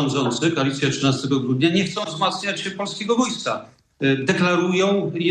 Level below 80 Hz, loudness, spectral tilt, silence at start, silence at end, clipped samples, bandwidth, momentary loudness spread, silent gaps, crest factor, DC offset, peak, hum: -62 dBFS; -21 LUFS; -5 dB/octave; 0 s; 0 s; under 0.1%; 10 kHz; 7 LU; none; 16 dB; under 0.1%; -4 dBFS; none